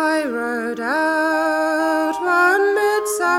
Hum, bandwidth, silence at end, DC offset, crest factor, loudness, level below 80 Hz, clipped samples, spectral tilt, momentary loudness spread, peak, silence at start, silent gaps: none; 16.5 kHz; 0 s; under 0.1%; 14 dB; -18 LUFS; -62 dBFS; under 0.1%; -2.5 dB/octave; 7 LU; -4 dBFS; 0 s; none